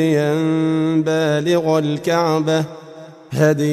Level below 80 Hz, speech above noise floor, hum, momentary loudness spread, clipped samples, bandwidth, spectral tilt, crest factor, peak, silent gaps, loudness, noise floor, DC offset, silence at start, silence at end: -60 dBFS; 22 dB; none; 10 LU; under 0.1%; 14 kHz; -6.5 dB/octave; 16 dB; -2 dBFS; none; -18 LUFS; -38 dBFS; under 0.1%; 0 s; 0 s